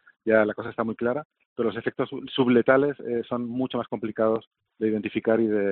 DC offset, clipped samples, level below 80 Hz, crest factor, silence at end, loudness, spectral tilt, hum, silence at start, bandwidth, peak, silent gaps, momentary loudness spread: under 0.1%; under 0.1%; -66 dBFS; 20 dB; 0 s; -25 LUFS; -4.5 dB/octave; none; 0.25 s; 4.3 kHz; -6 dBFS; 1.25-1.30 s, 1.46-1.56 s, 4.47-4.51 s; 9 LU